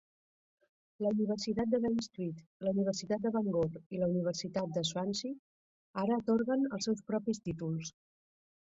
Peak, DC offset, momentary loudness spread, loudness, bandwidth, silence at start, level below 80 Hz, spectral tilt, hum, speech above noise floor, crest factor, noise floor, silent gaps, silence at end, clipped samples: -20 dBFS; under 0.1%; 9 LU; -35 LUFS; 8 kHz; 1 s; -68 dBFS; -6 dB/octave; none; over 56 dB; 16 dB; under -90 dBFS; 2.46-2.60 s, 3.86-3.90 s, 5.39-5.94 s; 0.75 s; under 0.1%